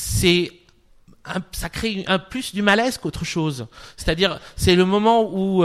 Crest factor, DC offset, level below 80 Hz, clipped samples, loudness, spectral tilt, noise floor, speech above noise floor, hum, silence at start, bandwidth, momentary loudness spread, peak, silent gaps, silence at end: 18 dB; under 0.1%; -38 dBFS; under 0.1%; -20 LUFS; -4.5 dB/octave; -53 dBFS; 33 dB; none; 0 s; 15.5 kHz; 13 LU; -4 dBFS; none; 0 s